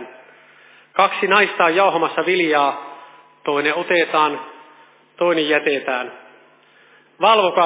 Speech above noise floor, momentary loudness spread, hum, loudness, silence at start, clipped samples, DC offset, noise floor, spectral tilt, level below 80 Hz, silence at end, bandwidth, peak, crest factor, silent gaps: 35 dB; 16 LU; none; -17 LUFS; 0 s; under 0.1%; under 0.1%; -52 dBFS; -7.5 dB/octave; -84 dBFS; 0 s; 4 kHz; 0 dBFS; 18 dB; none